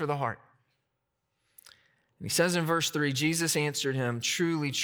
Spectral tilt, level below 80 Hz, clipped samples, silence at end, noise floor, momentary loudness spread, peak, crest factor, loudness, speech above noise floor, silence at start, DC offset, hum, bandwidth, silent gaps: -3.5 dB/octave; -74 dBFS; under 0.1%; 0 s; -81 dBFS; 7 LU; -12 dBFS; 18 dB; -28 LUFS; 52 dB; 0 s; under 0.1%; none; over 20 kHz; none